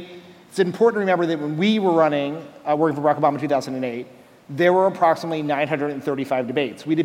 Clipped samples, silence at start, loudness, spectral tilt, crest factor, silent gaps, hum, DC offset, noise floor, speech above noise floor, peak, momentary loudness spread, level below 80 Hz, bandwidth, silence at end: under 0.1%; 0 s; -21 LUFS; -6.5 dB/octave; 16 dB; none; none; under 0.1%; -43 dBFS; 22 dB; -4 dBFS; 11 LU; -72 dBFS; 16 kHz; 0 s